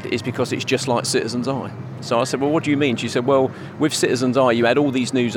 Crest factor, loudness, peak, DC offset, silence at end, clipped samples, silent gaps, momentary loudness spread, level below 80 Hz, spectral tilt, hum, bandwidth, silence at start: 18 dB; -20 LUFS; -2 dBFS; under 0.1%; 0 s; under 0.1%; none; 8 LU; -68 dBFS; -5 dB/octave; none; 17.5 kHz; 0 s